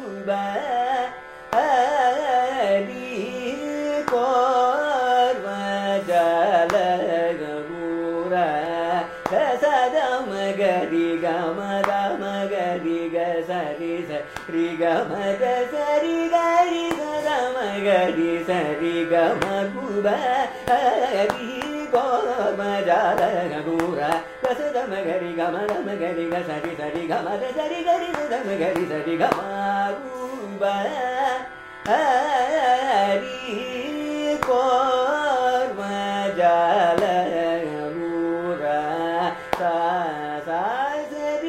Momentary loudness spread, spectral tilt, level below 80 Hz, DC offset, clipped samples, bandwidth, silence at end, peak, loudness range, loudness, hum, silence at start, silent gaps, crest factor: 8 LU; -5 dB/octave; -58 dBFS; under 0.1%; under 0.1%; 15.5 kHz; 0 s; -2 dBFS; 4 LU; -23 LUFS; none; 0 s; none; 22 dB